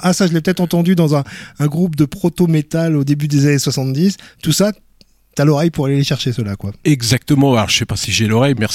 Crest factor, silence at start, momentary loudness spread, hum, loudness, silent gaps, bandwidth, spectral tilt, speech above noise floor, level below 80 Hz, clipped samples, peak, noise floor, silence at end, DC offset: 14 dB; 0 s; 6 LU; none; -15 LUFS; none; 16 kHz; -5.5 dB/octave; 35 dB; -44 dBFS; under 0.1%; -2 dBFS; -50 dBFS; 0 s; under 0.1%